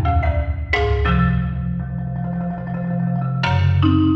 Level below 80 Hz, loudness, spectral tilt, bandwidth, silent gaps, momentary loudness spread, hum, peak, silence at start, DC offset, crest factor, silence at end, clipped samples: -26 dBFS; -20 LUFS; -8.5 dB/octave; 6.4 kHz; none; 9 LU; none; -4 dBFS; 0 s; under 0.1%; 14 dB; 0 s; under 0.1%